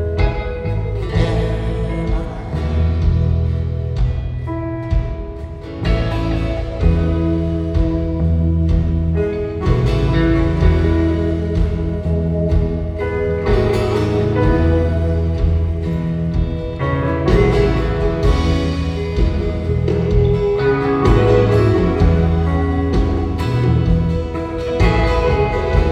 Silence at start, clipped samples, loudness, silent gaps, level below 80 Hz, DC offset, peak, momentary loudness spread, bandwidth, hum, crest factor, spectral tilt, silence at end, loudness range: 0 s; under 0.1%; -17 LUFS; none; -20 dBFS; under 0.1%; 0 dBFS; 7 LU; 8.6 kHz; none; 16 dB; -8.5 dB/octave; 0 s; 5 LU